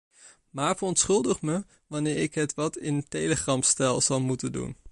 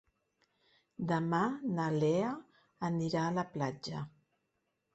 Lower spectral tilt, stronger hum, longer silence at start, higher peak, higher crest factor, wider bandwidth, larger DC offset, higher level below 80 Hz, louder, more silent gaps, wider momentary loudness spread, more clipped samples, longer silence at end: second, -4 dB/octave vs -7 dB/octave; neither; second, 0.25 s vs 1 s; first, -10 dBFS vs -20 dBFS; about the same, 18 dB vs 16 dB; first, 11.5 kHz vs 8.2 kHz; neither; first, -56 dBFS vs -72 dBFS; first, -26 LUFS vs -35 LUFS; neither; about the same, 10 LU vs 12 LU; neither; second, 0 s vs 0.85 s